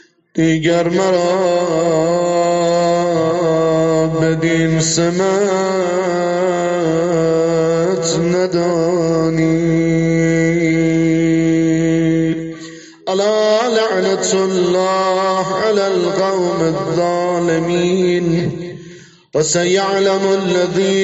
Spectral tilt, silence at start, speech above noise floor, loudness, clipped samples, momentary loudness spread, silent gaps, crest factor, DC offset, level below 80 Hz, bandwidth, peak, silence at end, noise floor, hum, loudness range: -5.5 dB/octave; 0.35 s; 25 dB; -15 LUFS; under 0.1%; 3 LU; none; 12 dB; under 0.1%; -48 dBFS; 8 kHz; -2 dBFS; 0 s; -39 dBFS; none; 2 LU